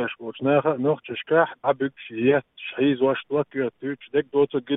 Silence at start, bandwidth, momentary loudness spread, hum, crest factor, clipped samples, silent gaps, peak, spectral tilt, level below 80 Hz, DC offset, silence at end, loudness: 0 s; 3.9 kHz; 8 LU; none; 18 dB; under 0.1%; none; -6 dBFS; -10.5 dB/octave; -70 dBFS; under 0.1%; 0 s; -24 LUFS